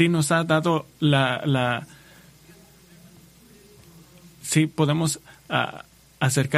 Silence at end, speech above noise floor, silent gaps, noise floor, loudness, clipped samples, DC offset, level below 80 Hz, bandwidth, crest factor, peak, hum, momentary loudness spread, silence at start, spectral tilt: 0 s; 29 dB; none; -51 dBFS; -23 LUFS; under 0.1%; under 0.1%; -60 dBFS; 15 kHz; 22 dB; -2 dBFS; none; 11 LU; 0 s; -5 dB/octave